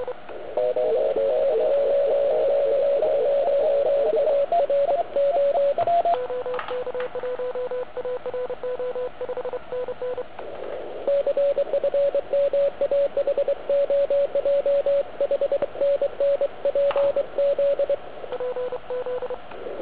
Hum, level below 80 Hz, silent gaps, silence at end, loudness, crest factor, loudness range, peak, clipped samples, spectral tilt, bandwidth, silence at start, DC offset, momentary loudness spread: none; -58 dBFS; none; 0 s; -23 LUFS; 12 dB; 8 LU; -12 dBFS; under 0.1%; -8 dB/octave; 4 kHz; 0 s; 1%; 10 LU